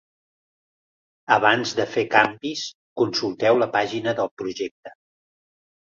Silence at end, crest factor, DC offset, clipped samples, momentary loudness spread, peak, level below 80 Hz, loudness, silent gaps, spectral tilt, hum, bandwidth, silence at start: 1.05 s; 22 dB; under 0.1%; under 0.1%; 13 LU; -2 dBFS; -66 dBFS; -22 LUFS; 2.75-2.96 s, 4.31-4.37 s, 4.71-4.83 s; -4 dB/octave; none; 7.6 kHz; 1.3 s